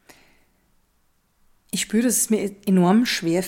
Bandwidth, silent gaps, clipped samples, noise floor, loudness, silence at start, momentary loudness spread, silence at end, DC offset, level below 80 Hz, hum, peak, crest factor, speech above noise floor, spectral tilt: 17 kHz; none; under 0.1%; -65 dBFS; -20 LUFS; 1.75 s; 8 LU; 0 s; under 0.1%; -60 dBFS; none; -8 dBFS; 16 dB; 45 dB; -4.5 dB/octave